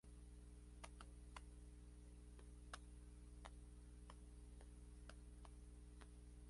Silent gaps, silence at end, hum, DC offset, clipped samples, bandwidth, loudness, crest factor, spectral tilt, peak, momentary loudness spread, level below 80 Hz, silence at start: none; 0 s; 60 Hz at -60 dBFS; under 0.1%; under 0.1%; 11.5 kHz; -62 LUFS; 22 dB; -5 dB/octave; -38 dBFS; 4 LU; -60 dBFS; 0.05 s